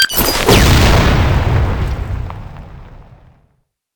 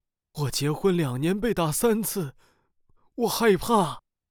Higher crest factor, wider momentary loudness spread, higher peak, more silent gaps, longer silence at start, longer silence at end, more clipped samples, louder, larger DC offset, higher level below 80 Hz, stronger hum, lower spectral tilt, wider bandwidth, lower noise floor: about the same, 14 dB vs 18 dB; first, 17 LU vs 13 LU; first, 0 dBFS vs -8 dBFS; neither; second, 0 s vs 0.35 s; first, 0.95 s vs 0.3 s; neither; first, -12 LUFS vs -25 LUFS; neither; first, -18 dBFS vs -50 dBFS; neither; about the same, -4.5 dB/octave vs -5 dB/octave; about the same, over 20 kHz vs over 20 kHz; about the same, -62 dBFS vs -64 dBFS